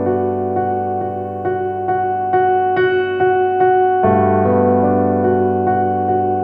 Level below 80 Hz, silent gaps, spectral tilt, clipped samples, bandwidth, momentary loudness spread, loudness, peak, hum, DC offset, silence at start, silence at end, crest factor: -54 dBFS; none; -10 dB/octave; under 0.1%; 4 kHz; 7 LU; -16 LUFS; -2 dBFS; none; under 0.1%; 0 s; 0 s; 12 dB